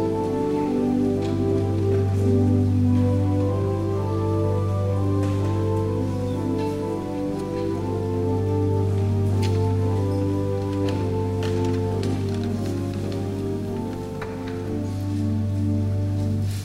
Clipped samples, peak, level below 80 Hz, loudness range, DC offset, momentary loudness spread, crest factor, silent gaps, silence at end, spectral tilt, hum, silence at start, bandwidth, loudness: under 0.1%; -10 dBFS; -46 dBFS; 5 LU; under 0.1%; 7 LU; 12 dB; none; 0 s; -8.5 dB/octave; 50 Hz at -45 dBFS; 0 s; 11 kHz; -24 LUFS